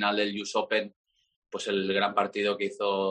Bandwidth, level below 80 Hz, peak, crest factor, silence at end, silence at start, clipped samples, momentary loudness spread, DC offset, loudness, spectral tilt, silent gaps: 10 kHz; -76 dBFS; -10 dBFS; 20 dB; 0 s; 0 s; under 0.1%; 8 LU; under 0.1%; -28 LUFS; -4 dB/octave; 0.96-1.04 s, 1.36-1.42 s